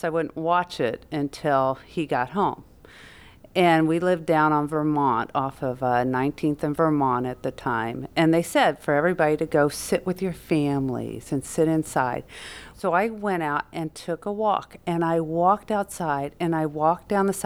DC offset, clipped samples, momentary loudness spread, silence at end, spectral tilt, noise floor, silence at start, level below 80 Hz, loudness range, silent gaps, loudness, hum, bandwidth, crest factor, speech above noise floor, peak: under 0.1%; under 0.1%; 9 LU; 0 s; -6 dB/octave; -48 dBFS; 0.05 s; -54 dBFS; 4 LU; none; -24 LUFS; none; 17 kHz; 16 dB; 24 dB; -8 dBFS